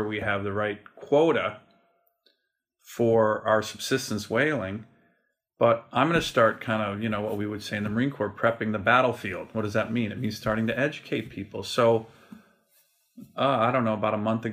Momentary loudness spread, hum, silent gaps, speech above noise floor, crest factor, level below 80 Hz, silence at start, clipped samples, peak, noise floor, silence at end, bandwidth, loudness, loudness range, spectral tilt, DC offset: 10 LU; none; none; 52 dB; 20 dB; -60 dBFS; 0 s; under 0.1%; -6 dBFS; -78 dBFS; 0 s; 15.5 kHz; -26 LUFS; 2 LU; -5.5 dB/octave; under 0.1%